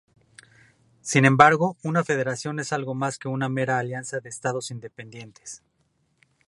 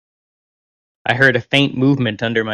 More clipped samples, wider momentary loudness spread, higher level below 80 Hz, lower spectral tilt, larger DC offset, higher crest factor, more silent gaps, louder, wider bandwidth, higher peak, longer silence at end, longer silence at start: neither; first, 24 LU vs 7 LU; second, -66 dBFS vs -56 dBFS; about the same, -5 dB/octave vs -6 dB/octave; neither; first, 26 dB vs 18 dB; neither; second, -23 LUFS vs -16 LUFS; about the same, 11.5 kHz vs 11.5 kHz; about the same, 0 dBFS vs 0 dBFS; first, 0.9 s vs 0 s; about the same, 1.05 s vs 1.05 s